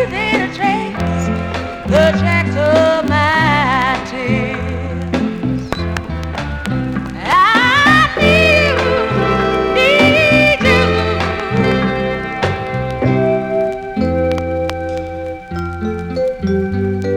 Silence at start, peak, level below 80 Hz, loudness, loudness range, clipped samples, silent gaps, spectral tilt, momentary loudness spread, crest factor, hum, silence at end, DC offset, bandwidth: 0 s; -2 dBFS; -32 dBFS; -14 LUFS; 8 LU; under 0.1%; none; -6 dB/octave; 12 LU; 12 dB; none; 0 s; under 0.1%; 16.5 kHz